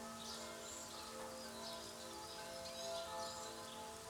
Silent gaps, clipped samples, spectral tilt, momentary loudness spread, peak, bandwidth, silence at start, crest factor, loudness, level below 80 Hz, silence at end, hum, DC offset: none; under 0.1%; -2 dB/octave; 4 LU; -34 dBFS; over 20 kHz; 0 s; 16 dB; -48 LUFS; -74 dBFS; 0 s; none; under 0.1%